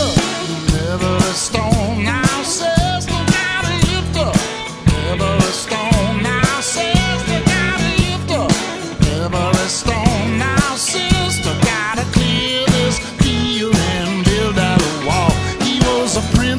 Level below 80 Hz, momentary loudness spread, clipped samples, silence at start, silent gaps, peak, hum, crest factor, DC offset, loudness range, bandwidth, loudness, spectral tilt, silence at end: -28 dBFS; 3 LU; under 0.1%; 0 s; none; 0 dBFS; none; 16 dB; 0.2%; 1 LU; 11 kHz; -16 LUFS; -4.5 dB/octave; 0 s